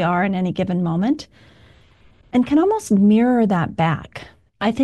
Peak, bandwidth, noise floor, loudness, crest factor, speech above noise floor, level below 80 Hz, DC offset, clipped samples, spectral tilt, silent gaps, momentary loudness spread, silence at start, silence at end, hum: -6 dBFS; 12 kHz; -52 dBFS; -19 LUFS; 12 dB; 34 dB; -52 dBFS; 0.1%; under 0.1%; -7 dB/octave; none; 10 LU; 0 s; 0 s; none